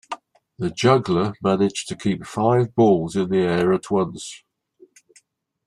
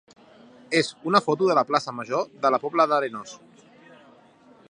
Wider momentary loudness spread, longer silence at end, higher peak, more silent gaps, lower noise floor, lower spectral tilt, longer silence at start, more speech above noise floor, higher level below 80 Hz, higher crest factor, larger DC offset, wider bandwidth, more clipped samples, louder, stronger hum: first, 12 LU vs 8 LU; about the same, 1.3 s vs 1.35 s; about the same, -4 dBFS vs -2 dBFS; neither; first, -59 dBFS vs -54 dBFS; first, -6 dB/octave vs -4.5 dB/octave; second, 0.1 s vs 0.7 s; first, 39 dB vs 31 dB; first, -58 dBFS vs -76 dBFS; second, 18 dB vs 24 dB; neither; about the same, 11.5 kHz vs 11 kHz; neither; first, -20 LUFS vs -23 LUFS; neither